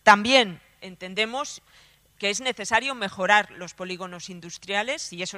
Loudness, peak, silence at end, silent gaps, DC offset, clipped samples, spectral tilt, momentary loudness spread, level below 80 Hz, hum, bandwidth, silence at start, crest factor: -24 LUFS; 0 dBFS; 0 s; none; under 0.1%; under 0.1%; -2.5 dB/octave; 19 LU; -64 dBFS; none; 14 kHz; 0.05 s; 24 dB